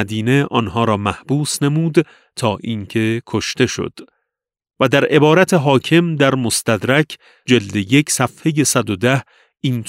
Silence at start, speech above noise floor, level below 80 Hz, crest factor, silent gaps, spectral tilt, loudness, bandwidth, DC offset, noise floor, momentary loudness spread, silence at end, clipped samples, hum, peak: 0 s; 63 dB; -52 dBFS; 16 dB; none; -5 dB/octave; -16 LUFS; 16 kHz; under 0.1%; -79 dBFS; 9 LU; 0 s; under 0.1%; none; 0 dBFS